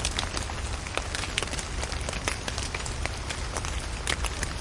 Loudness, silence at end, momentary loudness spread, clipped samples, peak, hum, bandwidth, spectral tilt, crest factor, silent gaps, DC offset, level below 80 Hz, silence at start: -31 LUFS; 0 s; 4 LU; under 0.1%; -6 dBFS; none; 11.5 kHz; -3 dB/octave; 24 dB; none; under 0.1%; -36 dBFS; 0 s